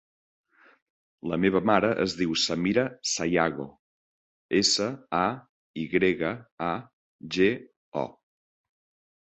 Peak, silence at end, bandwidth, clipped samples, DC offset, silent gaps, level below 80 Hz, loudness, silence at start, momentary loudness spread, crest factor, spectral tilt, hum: -6 dBFS; 1.15 s; 8.4 kHz; under 0.1%; under 0.1%; 3.79-4.49 s, 5.49-5.74 s, 6.52-6.58 s, 6.93-7.19 s, 7.76-7.92 s; -60 dBFS; -26 LUFS; 1.25 s; 14 LU; 22 dB; -4 dB/octave; none